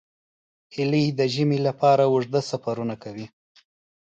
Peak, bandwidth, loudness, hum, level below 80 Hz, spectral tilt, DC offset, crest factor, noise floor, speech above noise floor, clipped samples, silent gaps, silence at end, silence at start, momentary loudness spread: -8 dBFS; 8.6 kHz; -23 LUFS; none; -66 dBFS; -6.5 dB/octave; under 0.1%; 16 dB; under -90 dBFS; over 68 dB; under 0.1%; none; 0.85 s; 0.75 s; 18 LU